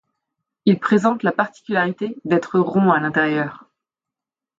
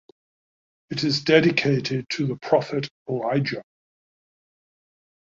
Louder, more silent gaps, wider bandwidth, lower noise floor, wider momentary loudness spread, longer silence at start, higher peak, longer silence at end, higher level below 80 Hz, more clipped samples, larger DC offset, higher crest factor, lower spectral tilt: first, -19 LUFS vs -23 LUFS; second, none vs 2.91-3.06 s; about the same, 7.8 kHz vs 7.6 kHz; about the same, -88 dBFS vs under -90 dBFS; second, 7 LU vs 12 LU; second, 0.65 s vs 0.9 s; about the same, -4 dBFS vs -4 dBFS; second, 1.05 s vs 1.6 s; about the same, -66 dBFS vs -62 dBFS; neither; neither; second, 16 dB vs 22 dB; first, -7.5 dB/octave vs -6 dB/octave